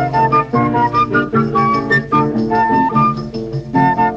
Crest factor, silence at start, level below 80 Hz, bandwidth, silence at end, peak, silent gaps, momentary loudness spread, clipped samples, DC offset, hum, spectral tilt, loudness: 12 dB; 0 s; -40 dBFS; 7.6 kHz; 0 s; -2 dBFS; none; 4 LU; under 0.1%; under 0.1%; none; -8 dB/octave; -14 LUFS